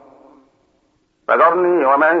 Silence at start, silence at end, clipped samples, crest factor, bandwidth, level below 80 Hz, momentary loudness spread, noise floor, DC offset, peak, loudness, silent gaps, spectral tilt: 1.3 s; 0 s; under 0.1%; 14 dB; 4.4 kHz; -70 dBFS; 7 LU; -62 dBFS; under 0.1%; -2 dBFS; -14 LUFS; none; -7.5 dB/octave